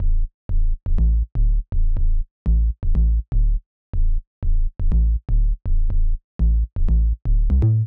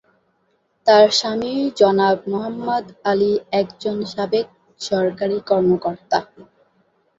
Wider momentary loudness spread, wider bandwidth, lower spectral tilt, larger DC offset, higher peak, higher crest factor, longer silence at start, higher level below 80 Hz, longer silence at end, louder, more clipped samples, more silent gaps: second, 7 LU vs 10 LU; second, 1.4 kHz vs 7.8 kHz; first, -12 dB/octave vs -5 dB/octave; first, 0.6% vs under 0.1%; second, -12 dBFS vs -2 dBFS; second, 6 dB vs 18 dB; second, 0 s vs 0.85 s; first, -18 dBFS vs -60 dBFS; second, 0 s vs 0.75 s; second, -24 LUFS vs -19 LUFS; neither; first, 0.34-0.49 s, 2.31-2.45 s, 3.66-3.93 s, 4.27-4.42 s, 6.24-6.39 s vs none